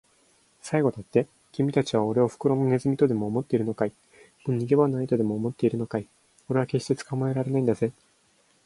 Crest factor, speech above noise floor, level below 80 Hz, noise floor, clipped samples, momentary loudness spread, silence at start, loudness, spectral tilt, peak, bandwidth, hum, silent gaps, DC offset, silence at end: 18 dB; 39 dB; -62 dBFS; -64 dBFS; under 0.1%; 7 LU; 0.65 s; -26 LUFS; -7.5 dB/octave; -8 dBFS; 11.5 kHz; none; none; under 0.1%; 0.75 s